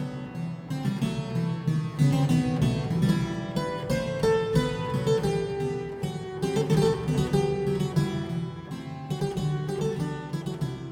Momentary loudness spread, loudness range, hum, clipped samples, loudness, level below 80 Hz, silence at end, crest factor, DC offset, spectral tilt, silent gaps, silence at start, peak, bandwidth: 10 LU; 3 LU; none; under 0.1%; -28 LUFS; -48 dBFS; 0 s; 16 dB; under 0.1%; -7 dB/octave; none; 0 s; -10 dBFS; 16 kHz